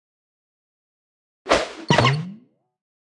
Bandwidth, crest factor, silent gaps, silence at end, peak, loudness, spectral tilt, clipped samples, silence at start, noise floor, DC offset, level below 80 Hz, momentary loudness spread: 11.5 kHz; 24 dB; none; 0.7 s; 0 dBFS; -20 LUFS; -5 dB/octave; under 0.1%; 1.45 s; -47 dBFS; under 0.1%; -50 dBFS; 18 LU